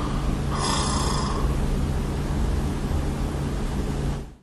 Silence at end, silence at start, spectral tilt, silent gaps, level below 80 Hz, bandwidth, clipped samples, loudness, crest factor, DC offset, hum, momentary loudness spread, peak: 0.1 s; 0 s; -5.5 dB/octave; none; -28 dBFS; 12.5 kHz; under 0.1%; -26 LUFS; 14 dB; under 0.1%; none; 5 LU; -10 dBFS